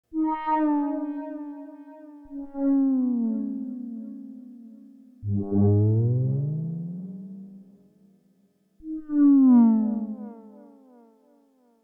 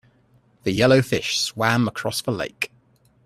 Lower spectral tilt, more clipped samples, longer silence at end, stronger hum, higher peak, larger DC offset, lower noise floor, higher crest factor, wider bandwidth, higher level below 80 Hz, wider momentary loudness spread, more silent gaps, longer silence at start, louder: first, -13 dB/octave vs -4.5 dB/octave; neither; first, 1.35 s vs 0.6 s; neither; second, -10 dBFS vs -2 dBFS; neither; first, -65 dBFS vs -59 dBFS; about the same, 16 dB vs 20 dB; second, 3.3 kHz vs 14.5 kHz; second, -64 dBFS vs -56 dBFS; first, 23 LU vs 12 LU; neither; second, 0.1 s vs 0.65 s; about the same, -24 LUFS vs -22 LUFS